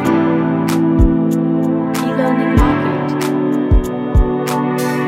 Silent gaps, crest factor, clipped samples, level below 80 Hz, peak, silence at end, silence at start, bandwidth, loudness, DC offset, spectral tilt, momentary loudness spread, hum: none; 14 dB; under 0.1%; -20 dBFS; 0 dBFS; 0 s; 0 s; 16.5 kHz; -15 LUFS; under 0.1%; -7 dB/octave; 4 LU; none